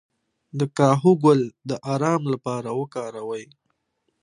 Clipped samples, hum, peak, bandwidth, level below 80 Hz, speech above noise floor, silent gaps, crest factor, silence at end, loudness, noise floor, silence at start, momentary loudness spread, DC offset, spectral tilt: under 0.1%; none; -2 dBFS; 11 kHz; -70 dBFS; 52 dB; none; 20 dB; 0.8 s; -22 LUFS; -74 dBFS; 0.55 s; 15 LU; under 0.1%; -7.5 dB/octave